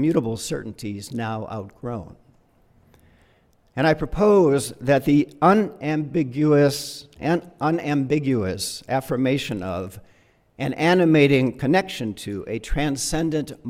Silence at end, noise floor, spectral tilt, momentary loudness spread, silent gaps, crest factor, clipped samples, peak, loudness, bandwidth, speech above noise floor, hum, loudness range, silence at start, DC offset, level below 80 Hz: 0 s; -59 dBFS; -6 dB/octave; 14 LU; none; 18 dB; under 0.1%; -4 dBFS; -22 LUFS; 16.5 kHz; 38 dB; none; 9 LU; 0 s; under 0.1%; -42 dBFS